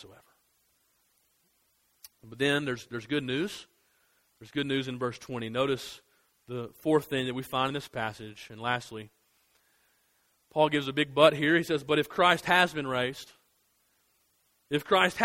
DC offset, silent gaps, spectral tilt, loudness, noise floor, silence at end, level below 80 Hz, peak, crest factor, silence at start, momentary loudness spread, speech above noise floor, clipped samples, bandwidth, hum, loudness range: under 0.1%; none; -5 dB/octave; -28 LUFS; -71 dBFS; 0 s; -66 dBFS; -6 dBFS; 26 dB; 0.05 s; 19 LU; 43 dB; under 0.1%; 16 kHz; none; 9 LU